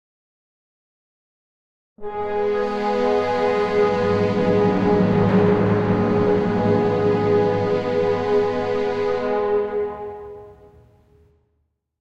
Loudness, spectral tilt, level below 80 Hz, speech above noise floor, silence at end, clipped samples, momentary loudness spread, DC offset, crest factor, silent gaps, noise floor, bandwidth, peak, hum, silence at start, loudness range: -20 LUFS; -8 dB/octave; -48 dBFS; 49 dB; 1.5 s; under 0.1%; 8 LU; under 0.1%; 16 dB; none; -70 dBFS; 7.6 kHz; -4 dBFS; none; 2 s; 7 LU